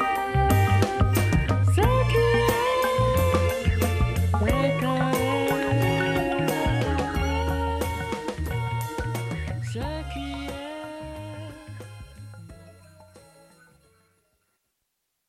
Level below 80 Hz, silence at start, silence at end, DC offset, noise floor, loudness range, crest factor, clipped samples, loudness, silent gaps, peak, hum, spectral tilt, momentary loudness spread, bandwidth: -34 dBFS; 0 s; 2.1 s; under 0.1%; -78 dBFS; 16 LU; 18 dB; under 0.1%; -24 LUFS; none; -8 dBFS; none; -6 dB/octave; 16 LU; 15.5 kHz